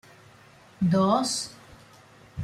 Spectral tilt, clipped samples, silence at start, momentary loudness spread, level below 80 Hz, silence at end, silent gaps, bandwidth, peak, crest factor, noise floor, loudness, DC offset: -5.5 dB/octave; under 0.1%; 0.8 s; 16 LU; -62 dBFS; 0 s; none; 13.5 kHz; -10 dBFS; 18 dB; -53 dBFS; -25 LUFS; under 0.1%